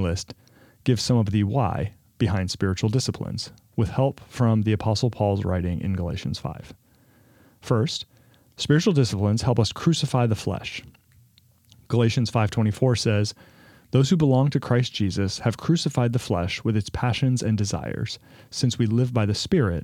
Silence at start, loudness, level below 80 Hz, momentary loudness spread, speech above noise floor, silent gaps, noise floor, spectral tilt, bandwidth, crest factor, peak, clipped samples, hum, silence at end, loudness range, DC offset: 0 s; -24 LUFS; -50 dBFS; 10 LU; 35 dB; none; -58 dBFS; -6 dB/octave; 13 kHz; 18 dB; -4 dBFS; under 0.1%; none; 0 s; 3 LU; under 0.1%